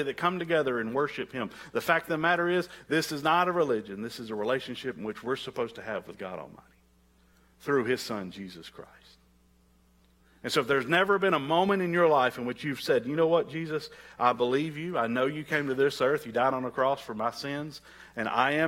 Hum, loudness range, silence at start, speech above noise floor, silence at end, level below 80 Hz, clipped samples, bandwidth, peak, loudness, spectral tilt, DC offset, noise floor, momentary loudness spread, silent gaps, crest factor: none; 9 LU; 0 s; 35 dB; 0 s; -66 dBFS; under 0.1%; 16.5 kHz; -8 dBFS; -28 LUFS; -5 dB/octave; under 0.1%; -63 dBFS; 13 LU; none; 20 dB